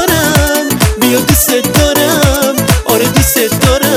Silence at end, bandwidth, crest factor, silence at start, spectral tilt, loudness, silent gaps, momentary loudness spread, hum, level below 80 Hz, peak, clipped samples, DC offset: 0 s; 18.5 kHz; 10 dB; 0 s; -4 dB/octave; -9 LUFS; none; 2 LU; none; -20 dBFS; 0 dBFS; 0.2%; under 0.1%